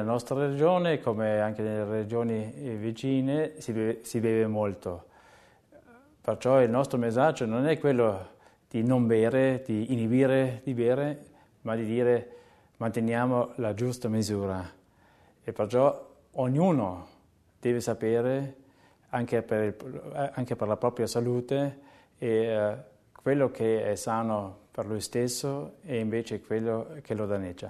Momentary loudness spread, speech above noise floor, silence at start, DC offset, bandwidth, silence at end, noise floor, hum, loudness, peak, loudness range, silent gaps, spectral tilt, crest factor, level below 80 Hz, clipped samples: 11 LU; 34 dB; 0 s; under 0.1%; 13.5 kHz; 0 s; -62 dBFS; none; -28 LUFS; -10 dBFS; 5 LU; none; -6.5 dB/octave; 18 dB; -64 dBFS; under 0.1%